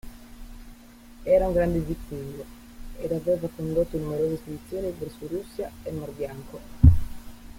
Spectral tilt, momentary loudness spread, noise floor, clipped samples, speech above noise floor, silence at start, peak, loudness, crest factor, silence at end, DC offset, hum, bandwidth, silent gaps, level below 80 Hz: -8.5 dB/octave; 26 LU; -47 dBFS; under 0.1%; 20 dB; 0.05 s; -2 dBFS; -27 LUFS; 24 dB; 0 s; under 0.1%; none; 16.5 kHz; none; -34 dBFS